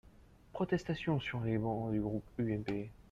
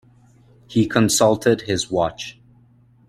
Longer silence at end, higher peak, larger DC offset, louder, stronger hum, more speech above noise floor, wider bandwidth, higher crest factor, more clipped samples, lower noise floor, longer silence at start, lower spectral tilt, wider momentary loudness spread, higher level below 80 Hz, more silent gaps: second, 0.1 s vs 0.8 s; second, -20 dBFS vs -2 dBFS; neither; second, -37 LUFS vs -19 LUFS; neither; second, 24 dB vs 35 dB; second, 7.8 kHz vs 16 kHz; about the same, 18 dB vs 20 dB; neither; first, -61 dBFS vs -53 dBFS; second, 0.05 s vs 0.7 s; first, -8 dB/octave vs -4.5 dB/octave; second, 5 LU vs 11 LU; second, -58 dBFS vs -52 dBFS; neither